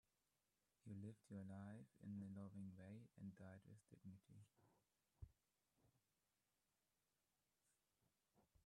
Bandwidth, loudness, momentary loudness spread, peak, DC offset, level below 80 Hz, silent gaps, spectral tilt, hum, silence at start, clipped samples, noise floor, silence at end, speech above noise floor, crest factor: 10.5 kHz; -60 LUFS; 11 LU; -46 dBFS; under 0.1%; -82 dBFS; none; -8 dB/octave; none; 0.85 s; under 0.1%; under -90 dBFS; 0.05 s; over 31 dB; 16 dB